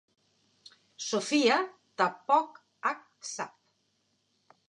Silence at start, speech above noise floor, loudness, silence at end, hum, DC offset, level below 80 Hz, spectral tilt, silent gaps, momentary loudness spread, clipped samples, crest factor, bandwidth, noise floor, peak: 1 s; 46 dB; -30 LUFS; 1.2 s; none; under 0.1%; under -90 dBFS; -2.5 dB/octave; none; 15 LU; under 0.1%; 22 dB; 11 kHz; -75 dBFS; -10 dBFS